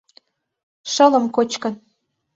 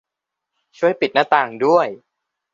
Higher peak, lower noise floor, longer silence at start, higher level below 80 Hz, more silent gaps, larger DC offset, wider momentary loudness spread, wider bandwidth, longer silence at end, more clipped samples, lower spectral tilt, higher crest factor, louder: about the same, -2 dBFS vs -2 dBFS; second, -57 dBFS vs -83 dBFS; about the same, 0.85 s vs 0.8 s; about the same, -70 dBFS vs -68 dBFS; neither; neither; first, 20 LU vs 5 LU; about the same, 8 kHz vs 7.4 kHz; about the same, 0.6 s vs 0.6 s; neither; second, -3 dB/octave vs -5.5 dB/octave; about the same, 18 dB vs 18 dB; about the same, -18 LUFS vs -18 LUFS